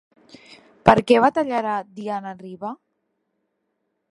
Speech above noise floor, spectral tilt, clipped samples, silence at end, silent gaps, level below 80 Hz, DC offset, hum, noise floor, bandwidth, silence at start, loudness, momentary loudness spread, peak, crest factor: 55 dB; -6.5 dB/octave; under 0.1%; 1.4 s; none; -56 dBFS; under 0.1%; none; -75 dBFS; 11.5 kHz; 0.85 s; -20 LUFS; 18 LU; 0 dBFS; 22 dB